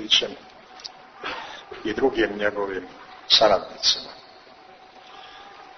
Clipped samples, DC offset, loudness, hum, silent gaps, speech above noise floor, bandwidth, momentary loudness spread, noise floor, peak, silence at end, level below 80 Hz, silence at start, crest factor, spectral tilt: under 0.1%; under 0.1%; -22 LUFS; none; none; 26 dB; 6.6 kHz; 26 LU; -48 dBFS; -2 dBFS; 0.1 s; -56 dBFS; 0 s; 24 dB; -2 dB/octave